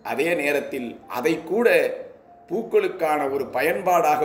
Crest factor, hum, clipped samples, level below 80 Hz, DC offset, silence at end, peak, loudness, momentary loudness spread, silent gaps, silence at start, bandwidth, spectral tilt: 18 dB; none; under 0.1%; -66 dBFS; under 0.1%; 0 s; -4 dBFS; -22 LUFS; 12 LU; none; 0.05 s; 16 kHz; -4.5 dB/octave